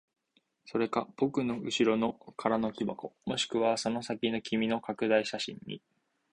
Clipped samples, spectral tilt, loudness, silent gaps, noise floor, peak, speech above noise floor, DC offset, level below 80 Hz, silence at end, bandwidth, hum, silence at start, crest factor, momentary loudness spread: under 0.1%; -4.5 dB/octave; -32 LUFS; none; -74 dBFS; -12 dBFS; 43 dB; under 0.1%; -68 dBFS; 0.55 s; 10.5 kHz; none; 0.65 s; 20 dB; 9 LU